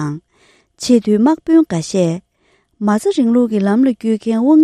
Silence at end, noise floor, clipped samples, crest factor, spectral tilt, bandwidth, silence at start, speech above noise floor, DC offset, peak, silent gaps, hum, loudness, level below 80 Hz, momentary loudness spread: 0 s; -59 dBFS; under 0.1%; 14 dB; -6.5 dB/octave; 12.5 kHz; 0 s; 46 dB; under 0.1%; 0 dBFS; none; none; -15 LUFS; -56 dBFS; 11 LU